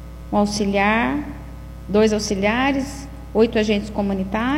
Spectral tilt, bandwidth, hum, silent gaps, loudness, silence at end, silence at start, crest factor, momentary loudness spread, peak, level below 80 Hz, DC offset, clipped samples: -5 dB/octave; 15.5 kHz; none; none; -20 LUFS; 0 s; 0 s; 16 dB; 16 LU; -4 dBFS; -36 dBFS; under 0.1%; under 0.1%